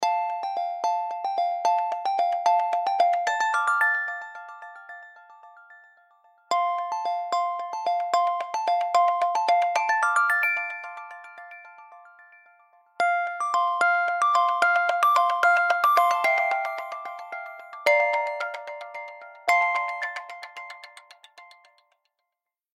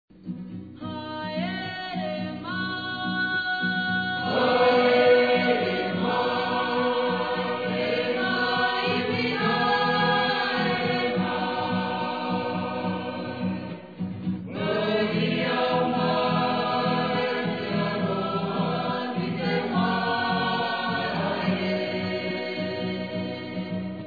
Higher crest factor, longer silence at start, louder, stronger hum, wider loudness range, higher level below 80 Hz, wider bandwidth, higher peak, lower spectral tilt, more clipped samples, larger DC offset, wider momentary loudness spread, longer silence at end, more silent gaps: about the same, 20 dB vs 18 dB; second, 0 s vs 0.15 s; about the same, -24 LUFS vs -25 LUFS; neither; about the same, 8 LU vs 6 LU; second, under -90 dBFS vs -64 dBFS; first, 15.5 kHz vs 4.9 kHz; about the same, -6 dBFS vs -8 dBFS; second, 0.5 dB/octave vs -7.5 dB/octave; neither; second, under 0.1% vs 0.1%; first, 19 LU vs 10 LU; first, 1.3 s vs 0 s; neither